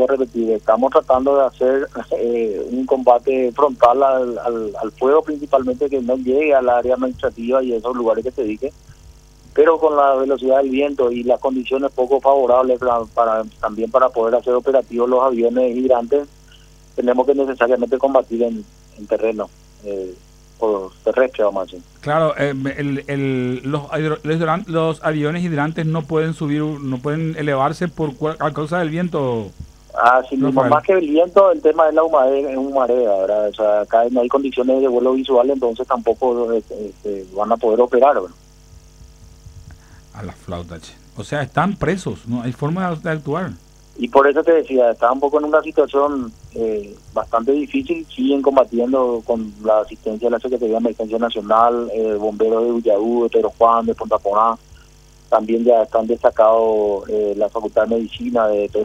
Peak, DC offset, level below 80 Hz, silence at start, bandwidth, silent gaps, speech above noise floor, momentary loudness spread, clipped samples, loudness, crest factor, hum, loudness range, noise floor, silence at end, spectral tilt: 0 dBFS; under 0.1%; -48 dBFS; 0 s; 10.5 kHz; none; 29 dB; 10 LU; under 0.1%; -17 LUFS; 16 dB; none; 5 LU; -46 dBFS; 0 s; -7.5 dB/octave